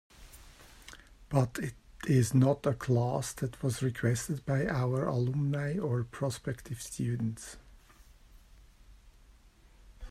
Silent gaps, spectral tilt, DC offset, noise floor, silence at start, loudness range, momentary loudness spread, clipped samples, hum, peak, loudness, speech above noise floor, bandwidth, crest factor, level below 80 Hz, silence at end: none; -6.5 dB/octave; under 0.1%; -59 dBFS; 0.2 s; 10 LU; 17 LU; under 0.1%; none; -12 dBFS; -32 LUFS; 28 dB; 14.5 kHz; 22 dB; -56 dBFS; 0 s